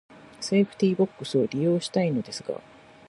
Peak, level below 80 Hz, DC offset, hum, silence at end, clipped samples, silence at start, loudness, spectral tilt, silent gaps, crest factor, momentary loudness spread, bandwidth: -10 dBFS; -68 dBFS; under 0.1%; none; 0.5 s; under 0.1%; 0.1 s; -26 LUFS; -6 dB/octave; none; 16 dB; 11 LU; 11.5 kHz